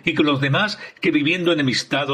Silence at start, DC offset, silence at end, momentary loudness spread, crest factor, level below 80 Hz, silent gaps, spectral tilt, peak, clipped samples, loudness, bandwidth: 0.05 s; under 0.1%; 0 s; 3 LU; 16 dB; -58 dBFS; none; -5 dB/octave; -4 dBFS; under 0.1%; -19 LUFS; 9.8 kHz